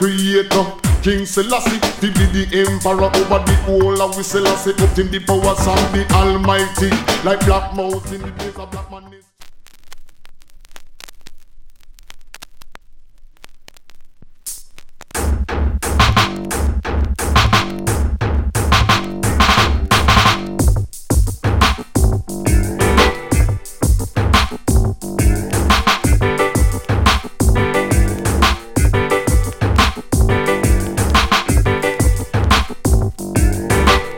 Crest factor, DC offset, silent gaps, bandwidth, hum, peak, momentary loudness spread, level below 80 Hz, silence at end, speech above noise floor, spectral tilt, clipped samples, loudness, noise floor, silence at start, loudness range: 16 dB; under 0.1%; none; 17 kHz; none; 0 dBFS; 7 LU; -20 dBFS; 0 s; 22 dB; -4.5 dB/octave; under 0.1%; -16 LUFS; -37 dBFS; 0 s; 5 LU